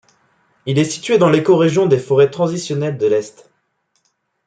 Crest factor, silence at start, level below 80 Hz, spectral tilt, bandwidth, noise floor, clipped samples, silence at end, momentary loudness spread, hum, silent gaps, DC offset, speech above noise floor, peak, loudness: 16 dB; 0.65 s; -60 dBFS; -6 dB/octave; 9.4 kHz; -66 dBFS; under 0.1%; 1.15 s; 8 LU; none; none; under 0.1%; 52 dB; -2 dBFS; -15 LUFS